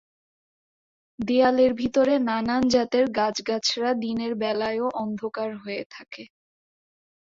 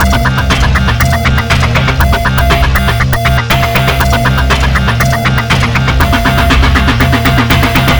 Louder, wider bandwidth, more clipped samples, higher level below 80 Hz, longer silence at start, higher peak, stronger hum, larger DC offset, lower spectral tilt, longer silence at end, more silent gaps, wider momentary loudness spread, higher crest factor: second, -24 LUFS vs -9 LUFS; second, 7.6 kHz vs over 20 kHz; second, under 0.1% vs 0.5%; second, -60 dBFS vs -14 dBFS; first, 1.2 s vs 0 s; second, -8 dBFS vs 0 dBFS; neither; second, under 0.1% vs 0.7%; about the same, -4 dB/octave vs -5 dB/octave; first, 1.1 s vs 0 s; first, 5.86-5.90 s vs none; first, 13 LU vs 2 LU; first, 18 dB vs 8 dB